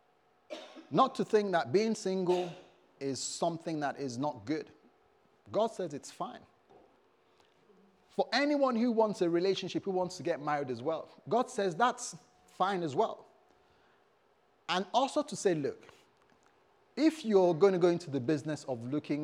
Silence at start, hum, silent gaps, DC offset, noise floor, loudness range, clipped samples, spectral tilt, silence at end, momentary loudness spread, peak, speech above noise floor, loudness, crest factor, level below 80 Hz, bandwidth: 0.5 s; none; none; under 0.1%; -69 dBFS; 7 LU; under 0.1%; -5 dB/octave; 0 s; 14 LU; -14 dBFS; 38 dB; -32 LUFS; 20 dB; -84 dBFS; 12 kHz